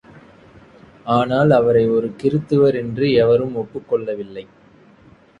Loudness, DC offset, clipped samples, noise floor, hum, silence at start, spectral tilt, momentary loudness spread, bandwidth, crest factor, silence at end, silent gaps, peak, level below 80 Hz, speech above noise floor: -17 LUFS; under 0.1%; under 0.1%; -49 dBFS; none; 1.05 s; -8.5 dB/octave; 14 LU; 7.6 kHz; 18 dB; 0.95 s; none; -2 dBFS; -52 dBFS; 32 dB